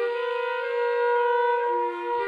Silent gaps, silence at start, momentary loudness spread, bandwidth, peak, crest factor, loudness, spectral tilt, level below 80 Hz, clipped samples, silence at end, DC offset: none; 0 s; 5 LU; 5 kHz; -14 dBFS; 12 dB; -25 LUFS; -3.5 dB/octave; -80 dBFS; under 0.1%; 0 s; under 0.1%